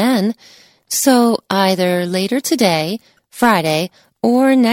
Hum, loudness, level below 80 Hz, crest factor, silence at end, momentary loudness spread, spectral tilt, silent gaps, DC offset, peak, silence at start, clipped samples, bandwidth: none; -15 LUFS; -62 dBFS; 16 dB; 0 s; 9 LU; -4.5 dB/octave; none; under 0.1%; 0 dBFS; 0 s; under 0.1%; 17 kHz